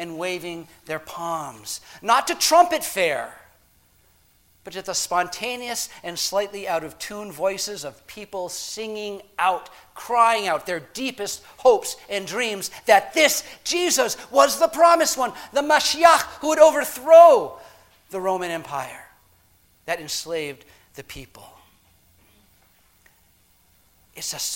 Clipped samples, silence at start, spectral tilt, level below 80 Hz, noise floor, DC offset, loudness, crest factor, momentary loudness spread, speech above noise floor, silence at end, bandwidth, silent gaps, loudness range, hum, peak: under 0.1%; 0 s; -1.5 dB/octave; -60 dBFS; -59 dBFS; under 0.1%; -20 LUFS; 22 dB; 17 LU; 38 dB; 0 s; 17 kHz; none; 16 LU; none; 0 dBFS